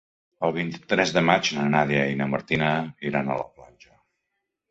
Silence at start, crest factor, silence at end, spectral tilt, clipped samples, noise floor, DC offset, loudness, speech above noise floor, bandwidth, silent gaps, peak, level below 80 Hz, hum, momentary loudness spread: 0.4 s; 22 dB; 1.1 s; -5 dB/octave; under 0.1%; -80 dBFS; under 0.1%; -24 LUFS; 57 dB; 8 kHz; none; -2 dBFS; -58 dBFS; none; 9 LU